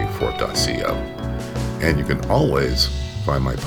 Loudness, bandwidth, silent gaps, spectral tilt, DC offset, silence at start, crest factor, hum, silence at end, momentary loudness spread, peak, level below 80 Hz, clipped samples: -21 LUFS; 19.5 kHz; none; -5 dB/octave; under 0.1%; 0 s; 20 dB; none; 0 s; 8 LU; -2 dBFS; -30 dBFS; under 0.1%